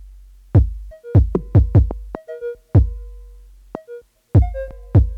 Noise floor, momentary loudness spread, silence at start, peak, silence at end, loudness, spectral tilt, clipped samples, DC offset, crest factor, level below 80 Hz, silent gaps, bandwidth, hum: -42 dBFS; 20 LU; 0 s; 0 dBFS; 0 s; -18 LUFS; -11.5 dB/octave; under 0.1%; under 0.1%; 18 dB; -24 dBFS; none; 2.6 kHz; none